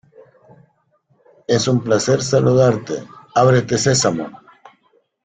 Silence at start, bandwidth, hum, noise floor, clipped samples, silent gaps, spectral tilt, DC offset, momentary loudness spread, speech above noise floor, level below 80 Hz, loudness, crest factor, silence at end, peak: 1.5 s; 9.4 kHz; none; -61 dBFS; under 0.1%; none; -5 dB/octave; under 0.1%; 14 LU; 46 dB; -52 dBFS; -17 LUFS; 16 dB; 0.9 s; -2 dBFS